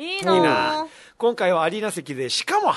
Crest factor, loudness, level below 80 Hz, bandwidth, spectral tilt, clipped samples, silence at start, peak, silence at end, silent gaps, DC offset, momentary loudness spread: 18 dB; -21 LUFS; -66 dBFS; 12.5 kHz; -4 dB/octave; under 0.1%; 0 s; -4 dBFS; 0 s; none; under 0.1%; 10 LU